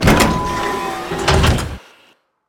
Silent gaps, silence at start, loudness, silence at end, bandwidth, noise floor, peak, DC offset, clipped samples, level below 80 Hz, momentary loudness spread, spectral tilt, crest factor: none; 0 s; -17 LUFS; 0.7 s; 18.5 kHz; -54 dBFS; 0 dBFS; under 0.1%; under 0.1%; -26 dBFS; 11 LU; -5 dB/octave; 16 dB